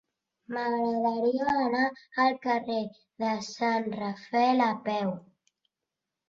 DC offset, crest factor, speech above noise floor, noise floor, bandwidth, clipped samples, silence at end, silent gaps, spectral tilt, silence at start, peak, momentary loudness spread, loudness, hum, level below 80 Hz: under 0.1%; 18 dB; 60 dB; -88 dBFS; 7.6 kHz; under 0.1%; 1.1 s; none; -5.5 dB/octave; 0.5 s; -10 dBFS; 8 LU; -28 LUFS; none; -70 dBFS